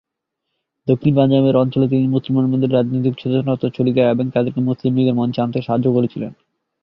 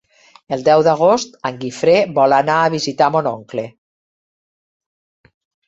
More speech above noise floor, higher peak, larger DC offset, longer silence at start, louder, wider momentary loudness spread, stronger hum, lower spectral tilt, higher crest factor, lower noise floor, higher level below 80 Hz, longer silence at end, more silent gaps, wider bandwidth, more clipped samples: second, 62 dB vs over 75 dB; about the same, -2 dBFS vs -2 dBFS; neither; first, 0.85 s vs 0.5 s; about the same, -17 LUFS vs -15 LUFS; second, 6 LU vs 13 LU; neither; first, -11 dB/octave vs -5 dB/octave; about the same, 16 dB vs 16 dB; second, -78 dBFS vs under -90 dBFS; first, -54 dBFS vs -60 dBFS; second, 0.5 s vs 2 s; neither; second, 5.6 kHz vs 8 kHz; neither